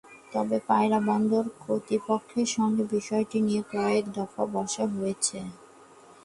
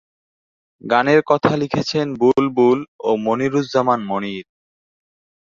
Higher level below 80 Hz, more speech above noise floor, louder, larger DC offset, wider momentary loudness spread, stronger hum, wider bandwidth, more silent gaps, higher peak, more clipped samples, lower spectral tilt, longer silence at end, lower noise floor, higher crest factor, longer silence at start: second, -68 dBFS vs -58 dBFS; second, 26 dB vs over 73 dB; second, -27 LUFS vs -18 LUFS; neither; about the same, 7 LU vs 9 LU; neither; first, 11.5 kHz vs 7.4 kHz; second, none vs 2.88-2.99 s; second, -10 dBFS vs -2 dBFS; neither; second, -5 dB/octave vs -6.5 dB/octave; second, 0.7 s vs 1 s; second, -52 dBFS vs under -90 dBFS; about the same, 18 dB vs 18 dB; second, 0.05 s vs 0.85 s